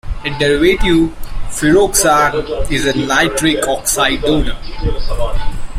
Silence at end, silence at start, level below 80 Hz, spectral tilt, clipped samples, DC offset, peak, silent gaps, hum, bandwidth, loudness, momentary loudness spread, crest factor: 0 s; 0.05 s; -22 dBFS; -3.5 dB/octave; under 0.1%; under 0.1%; 0 dBFS; none; none; 16 kHz; -14 LUFS; 12 LU; 14 dB